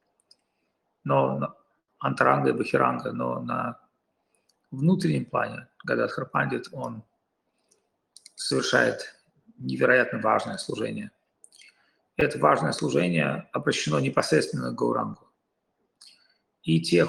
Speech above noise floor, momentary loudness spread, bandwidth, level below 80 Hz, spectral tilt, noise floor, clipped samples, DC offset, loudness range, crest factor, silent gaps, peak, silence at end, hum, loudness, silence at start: 51 dB; 15 LU; 12.5 kHz; -62 dBFS; -5.5 dB/octave; -76 dBFS; under 0.1%; under 0.1%; 4 LU; 22 dB; none; -4 dBFS; 0 s; none; -26 LUFS; 1.05 s